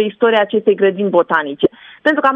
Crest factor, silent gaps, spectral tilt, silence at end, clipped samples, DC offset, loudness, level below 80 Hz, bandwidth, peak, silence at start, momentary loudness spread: 14 dB; none; -7 dB/octave; 0 s; under 0.1%; under 0.1%; -15 LUFS; -60 dBFS; 5.8 kHz; 0 dBFS; 0 s; 5 LU